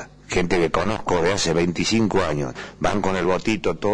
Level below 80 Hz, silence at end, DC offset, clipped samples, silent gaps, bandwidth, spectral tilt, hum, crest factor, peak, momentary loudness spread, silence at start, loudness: -40 dBFS; 0 s; under 0.1%; under 0.1%; none; 10.5 kHz; -5 dB/octave; none; 12 dB; -10 dBFS; 5 LU; 0 s; -22 LUFS